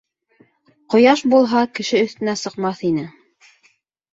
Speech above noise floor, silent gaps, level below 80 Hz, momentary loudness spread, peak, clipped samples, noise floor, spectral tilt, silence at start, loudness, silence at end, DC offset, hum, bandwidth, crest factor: 44 dB; none; -62 dBFS; 10 LU; -2 dBFS; under 0.1%; -60 dBFS; -5 dB/octave; 0.9 s; -17 LUFS; 1.05 s; under 0.1%; none; 8 kHz; 18 dB